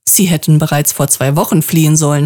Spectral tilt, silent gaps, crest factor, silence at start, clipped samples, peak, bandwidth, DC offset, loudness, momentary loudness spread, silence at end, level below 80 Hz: -4.5 dB/octave; none; 10 dB; 0.05 s; under 0.1%; 0 dBFS; 20 kHz; under 0.1%; -11 LUFS; 3 LU; 0 s; -46 dBFS